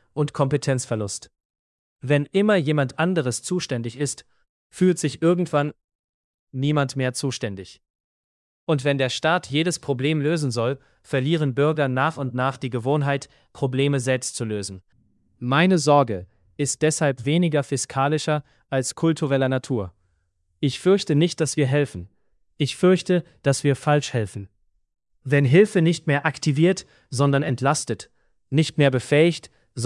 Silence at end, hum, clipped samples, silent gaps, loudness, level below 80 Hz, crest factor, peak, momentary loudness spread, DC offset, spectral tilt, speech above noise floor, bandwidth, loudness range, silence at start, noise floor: 0 s; none; under 0.1%; 1.45-1.96 s, 4.49-4.70 s, 5.84-5.88 s, 5.95-6.47 s, 7.90-8.67 s; -22 LUFS; -62 dBFS; 20 dB; -4 dBFS; 11 LU; under 0.1%; -5.5 dB/octave; 47 dB; 12 kHz; 4 LU; 0.15 s; -69 dBFS